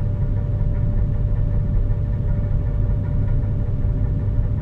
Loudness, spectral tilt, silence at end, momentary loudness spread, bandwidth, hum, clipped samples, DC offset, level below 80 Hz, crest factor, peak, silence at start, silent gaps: -23 LUFS; -11.5 dB/octave; 0 s; 1 LU; 3.1 kHz; none; under 0.1%; under 0.1%; -22 dBFS; 12 dB; -8 dBFS; 0 s; none